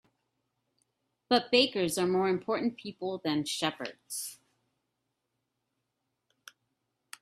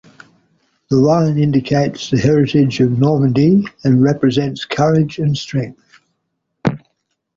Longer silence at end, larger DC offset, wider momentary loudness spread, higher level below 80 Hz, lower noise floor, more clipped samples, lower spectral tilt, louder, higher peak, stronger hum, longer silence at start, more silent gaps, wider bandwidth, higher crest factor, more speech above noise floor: first, 2.85 s vs 0.6 s; neither; first, 13 LU vs 9 LU; second, -74 dBFS vs -48 dBFS; first, -83 dBFS vs -72 dBFS; neither; second, -3.5 dB/octave vs -7.5 dB/octave; second, -30 LUFS vs -15 LUFS; second, -10 dBFS vs -2 dBFS; neither; first, 1.3 s vs 0.9 s; neither; first, 15.5 kHz vs 7.4 kHz; first, 24 dB vs 14 dB; second, 53 dB vs 58 dB